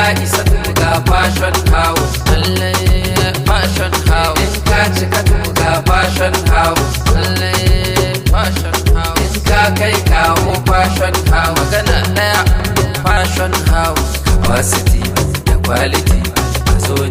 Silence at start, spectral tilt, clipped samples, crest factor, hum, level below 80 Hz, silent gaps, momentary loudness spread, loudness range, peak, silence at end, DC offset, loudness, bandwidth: 0 s; -4.5 dB/octave; under 0.1%; 12 dB; none; -18 dBFS; none; 3 LU; 1 LU; 0 dBFS; 0 s; under 0.1%; -13 LUFS; 16.5 kHz